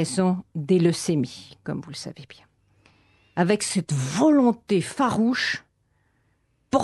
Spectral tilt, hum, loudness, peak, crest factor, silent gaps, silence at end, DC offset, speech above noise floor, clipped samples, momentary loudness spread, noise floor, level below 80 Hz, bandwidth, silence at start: -5.5 dB/octave; none; -23 LUFS; -6 dBFS; 18 dB; none; 0 s; under 0.1%; 45 dB; under 0.1%; 14 LU; -68 dBFS; -62 dBFS; 12 kHz; 0 s